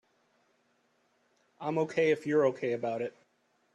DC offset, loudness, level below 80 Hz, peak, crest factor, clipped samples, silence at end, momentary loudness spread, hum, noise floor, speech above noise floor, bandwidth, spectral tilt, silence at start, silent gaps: under 0.1%; -31 LUFS; -78 dBFS; -16 dBFS; 18 dB; under 0.1%; 0.65 s; 11 LU; none; -73 dBFS; 43 dB; 9 kHz; -6.5 dB/octave; 1.6 s; none